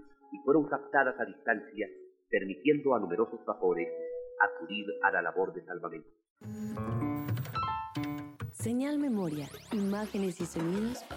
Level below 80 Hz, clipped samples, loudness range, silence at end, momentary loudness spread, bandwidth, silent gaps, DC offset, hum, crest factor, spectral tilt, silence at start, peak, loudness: -66 dBFS; under 0.1%; 5 LU; 0 s; 12 LU; 16 kHz; 6.30-6.36 s; under 0.1%; none; 22 dB; -6 dB/octave; 0 s; -12 dBFS; -33 LUFS